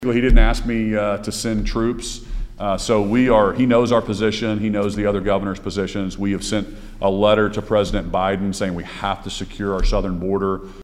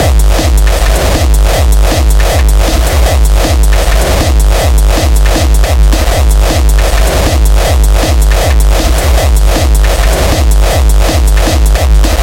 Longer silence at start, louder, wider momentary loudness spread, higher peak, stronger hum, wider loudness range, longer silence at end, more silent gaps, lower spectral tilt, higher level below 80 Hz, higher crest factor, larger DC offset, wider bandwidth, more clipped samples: about the same, 0 s vs 0 s; second, -20 LUFS vs -9 LUFS; first, 9 LU vs 1 LU; about the same, 0 dBFS vs 0 dBFS; neither; first, 3 LU vs 0 LU; about the same, 0 s vs 0 s; neither; about the same, -5.5 dB/octave vs -4.5 dB/octave; second, -26 dBFS vs -8 dBFS; first, 18 dB vs 6 dB; neither; second, 12.5 kHz vs 17 kHz; second, under 0.1% vs 0.2%